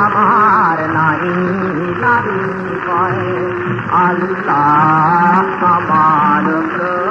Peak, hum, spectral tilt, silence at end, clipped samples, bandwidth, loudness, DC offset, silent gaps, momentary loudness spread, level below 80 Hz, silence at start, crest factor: 0 dBFS; none; -8 dB/octave; 0 s; under 0.1%; 7.8 kHz; -13 LUFS; under 0.1%; none; 8 LU; -50 dBFS; 0 s; 12 dB